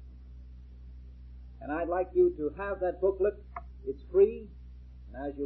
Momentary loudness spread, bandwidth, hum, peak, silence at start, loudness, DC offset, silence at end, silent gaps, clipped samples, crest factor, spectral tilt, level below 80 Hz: 25 LU; 4.1 kHz; none; -14 dBFS; 0 s; -30 LUFS; under 0.1%; 0 s; none; under 0.1%; 18 dB; -11 dB/octave; -48 dBFS